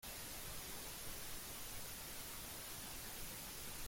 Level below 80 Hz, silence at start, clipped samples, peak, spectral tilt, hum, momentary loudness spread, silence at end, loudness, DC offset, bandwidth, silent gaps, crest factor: -60 dBFS; 0 s; under 0.1%; -36 dBFS; -1.5 dB/octave; none; 0 LU; 0 s; -48 LUFS; under 0.1%; 17 kHz; none; 14 dB